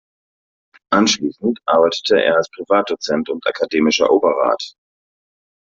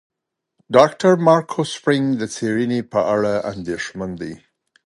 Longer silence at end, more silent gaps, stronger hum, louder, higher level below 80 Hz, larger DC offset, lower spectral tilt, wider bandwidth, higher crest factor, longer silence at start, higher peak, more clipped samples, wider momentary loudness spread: first, 0.95 s vs 0.5 s; neither; neither; about the same, -17 LUFS vs -19 LUFS; about the same, -60 dBFS vs -56 dBFS; neither; second, -3.5 dB/octave vs -6 dB/octave; second, 7.8 kHz vs 11.5 kHz; about the same, 16 dB vs 20 dB; first, 0.9 s vs 0.7 s; about the same, -2 dBFS vs 0 dBFS; neither; second, 7 LU vs 13 LU